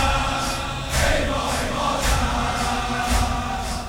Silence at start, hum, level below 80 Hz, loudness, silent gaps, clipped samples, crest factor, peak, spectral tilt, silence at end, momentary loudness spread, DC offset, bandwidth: 0 s; none; -28 dBFS; -22 LUFS; none; under 0.1%; 14 dB; -8 dBFS; -3.5 dB/octave; 0 s; 4 LU; under 0.1%; over 20 kHz